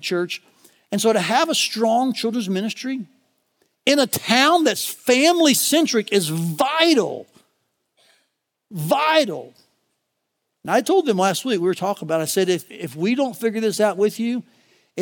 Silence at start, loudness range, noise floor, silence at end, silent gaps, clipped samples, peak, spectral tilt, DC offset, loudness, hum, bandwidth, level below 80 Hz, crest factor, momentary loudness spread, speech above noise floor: 0 s; 5 LU; -76 dBFS; 0 s; none; under 0.1%; -2 dBFS; -3.5 dB/octave; under 0.1%; -19 LUFS; none; 19.5 kHz; -80 dBFS; 20 dB; 12 LU; 57 dB